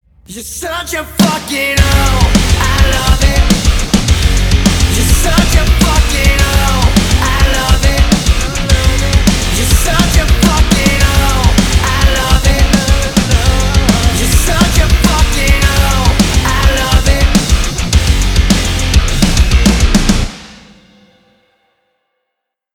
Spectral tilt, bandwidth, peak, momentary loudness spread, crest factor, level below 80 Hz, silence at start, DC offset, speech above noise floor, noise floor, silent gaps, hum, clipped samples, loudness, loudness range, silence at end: -4 dB/octave; 19.5 kHz; 0 dBFS; 3 LU; 10 dB; -12 dBFS; 0.3 s; under 0.1%; 65 dB; -75 dBFS; none; none; under 0.1%; -11 LUFS; 2 LU; 2.2 s